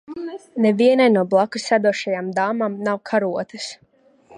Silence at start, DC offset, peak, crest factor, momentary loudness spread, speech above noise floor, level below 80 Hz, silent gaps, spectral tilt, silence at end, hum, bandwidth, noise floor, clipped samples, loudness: 0.1 s; under 0.1%; -4 dBFS; 16 dB; 16 LU; 33 dB; -72 dBFS; none; -5.5 dB/octave; 0 s; none; 11 kHz; -52 dBFS; under 0.1%; -19 LUFS